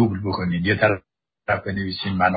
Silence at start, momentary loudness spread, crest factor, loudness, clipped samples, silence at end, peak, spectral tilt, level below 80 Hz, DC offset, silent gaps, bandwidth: 0 s; 8 LU; 18 dB; -23 LUFS; under 0.1%; 0 s; -4 dBFS; -11.5 dB/octave; -44 dBFS; under 0.1%; none; 5 kHz